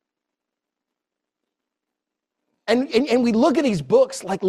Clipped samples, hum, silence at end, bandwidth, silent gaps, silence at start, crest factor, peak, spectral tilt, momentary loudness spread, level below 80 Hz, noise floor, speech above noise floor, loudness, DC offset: under 0.1%; none; 0 s; 13 kHz; none; 2.65 s; 18 dB; -4 dBFS; -5.5 dB/octave; 5 LU; -60 dBFS; -84 dBFS; 66 dB; -19 LUFS; under 0.1%